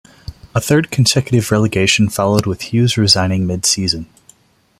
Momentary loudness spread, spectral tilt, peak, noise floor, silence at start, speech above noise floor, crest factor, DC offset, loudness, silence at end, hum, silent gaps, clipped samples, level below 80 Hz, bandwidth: 7 LU; -4.5 dB/octave; 0 dBFS; -50 dBFS; 0.3 s; 36 dB; 16 dB; under 0.1%; -14 LUFS; 0.75 s; none; none; under 0.1%; -42 dBFS; 16 kHz